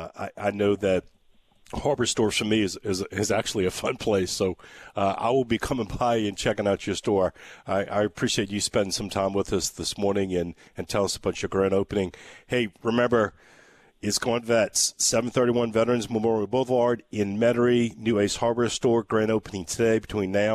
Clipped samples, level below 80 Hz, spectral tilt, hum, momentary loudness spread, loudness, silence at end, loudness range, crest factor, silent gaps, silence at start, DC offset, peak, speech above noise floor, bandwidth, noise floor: under 0.1%; -52 dBFS; -4 dB/octave; none; 7 LU; -25 LUFS; 0 s; 3 LU; 14 dB; none; 0 s; under 0.1%; -12 dBFS; 35 dB; 14 kHz; -60 dBFS